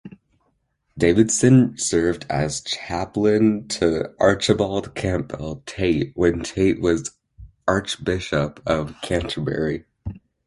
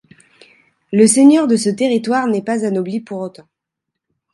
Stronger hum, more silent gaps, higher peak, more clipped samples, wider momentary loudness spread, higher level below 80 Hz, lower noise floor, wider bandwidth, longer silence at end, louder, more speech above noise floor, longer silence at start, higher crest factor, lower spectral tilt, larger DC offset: neither; neither; about the same, -2 dBFS vs 0 dBFS; neither; second, 10 LU vs 16 LU; first, -42 dBFS vs -68 dBFS; second, -69 dBFS vs -80 dBFS; about the same, 11.5 kHz vs 11.5 kHz; second, 0.3 s vs 1.05 s; second, -21 LUFS vs -14 LUFS; second, 48 dB vs 66 dB; second, 0.05 s vs 0.9 s; about the same, 20 dB vs 16 dB; about the same, -5 dB/octave vs -4.5 dB/octave; neither